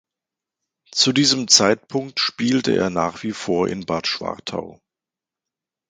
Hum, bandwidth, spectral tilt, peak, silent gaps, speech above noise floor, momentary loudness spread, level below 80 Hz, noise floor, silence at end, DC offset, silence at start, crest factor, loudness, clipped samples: none; 16 kHz; -3 dB/octave; 0 dBFS; none; 68 dB; 14 LU; -56 dBFS; -88 dBFS; 1.15 s; under 0.1%; 0.95 s; 22 dB; -19 LUFS; under 0.1%